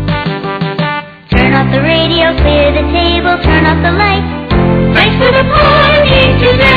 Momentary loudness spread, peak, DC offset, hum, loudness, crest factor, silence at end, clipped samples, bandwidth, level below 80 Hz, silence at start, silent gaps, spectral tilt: 8 LU; 0 dBFS; under 0.1%; none; -9 LUFS; 8 dB; 0 s; under 0.1%; 7 kHz; -20 dBFS; 0 s; none; -8 dB/octave